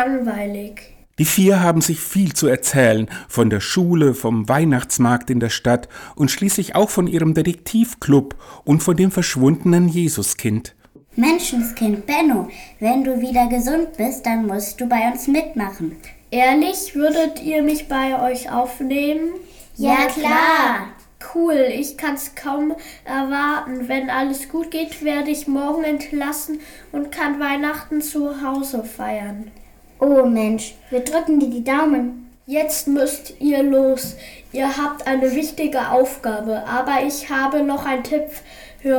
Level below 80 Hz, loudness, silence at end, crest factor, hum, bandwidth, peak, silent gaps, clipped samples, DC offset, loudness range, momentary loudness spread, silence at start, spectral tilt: -46 dBFS; -19 LUFS; 0 s; 16 dB; none; over 20 kHz; -2 dBFS; none; under 0.1%; under 0.1%; 5 LU; 11 LU; 0 s; -5 dB/octave